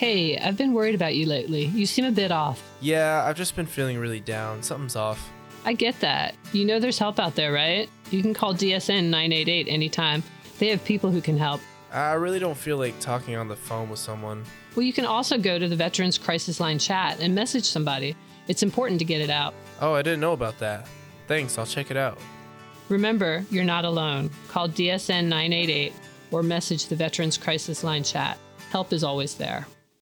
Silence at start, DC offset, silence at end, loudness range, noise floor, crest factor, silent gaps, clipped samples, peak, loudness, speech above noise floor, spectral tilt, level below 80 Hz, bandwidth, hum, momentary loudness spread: 0 s; under 0.1%; 0.4 s; 4 LU; -46 dBFS; 18 dB; none; under 0.1%; -8 dBFS; -25 LUFS; 20 dB; -4.5 dB/octave; -60 dBFS; 19.5 kHz; none; 9 LU